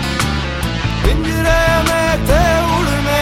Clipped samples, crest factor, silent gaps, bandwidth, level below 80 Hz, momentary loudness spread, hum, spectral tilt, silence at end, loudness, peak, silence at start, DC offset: under 0.1%; 14 dB; none; 16.5 kHz; -20 dBFS; 6 LU; none; -5 dB/octave; 0 s; -15 LUFS; 0 dBFS; 0 s; under 0.1%